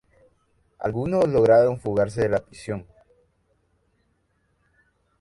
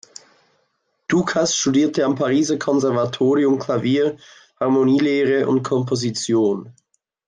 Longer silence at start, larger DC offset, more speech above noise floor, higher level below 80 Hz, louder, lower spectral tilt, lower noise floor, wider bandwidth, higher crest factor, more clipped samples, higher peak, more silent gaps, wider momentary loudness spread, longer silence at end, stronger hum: second, 0.8 s vs 1.1 s; neither; about the same, 48 dB vs 51 dB; first, -52 dBFS vs -62 dBFS; second, -22 LUFS vs -19 LUFS; first, -7.5 dB/octave vs -5 dB/octave; about the same, -69 dBFS vs -69 dBFS; first, 11.5 kHz vs 9.6 kHz; first, 20 dB vs 12 dB; neither; about the same, -6 dBFS vs -6 dBFS; neither; first, 17 LU vs 5 LU; first, 2.4 s vs 0.55 s; neither